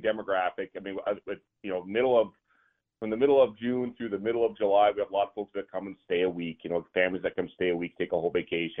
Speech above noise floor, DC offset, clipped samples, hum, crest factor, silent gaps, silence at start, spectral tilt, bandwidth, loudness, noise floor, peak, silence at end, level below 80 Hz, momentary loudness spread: 42 dB; under 0.1%; under 0.1%; none; 18 dB; none; 0 s; -9 dB/octave; 3.8 kHz; -29 LUFS; -70 dBFS; -12 dBFS; 0 s; -66 dBFS; 13 LU